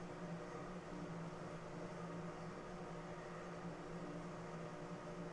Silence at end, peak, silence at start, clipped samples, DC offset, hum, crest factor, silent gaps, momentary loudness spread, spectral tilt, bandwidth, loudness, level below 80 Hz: 0 s; -36 dBFS; 0 s; under 0.1%; under 0.1%; none; 12 dB; none; 2 LU; -6.5 dB/octave; 11 kHz; -50 LUFS; -66 dBFS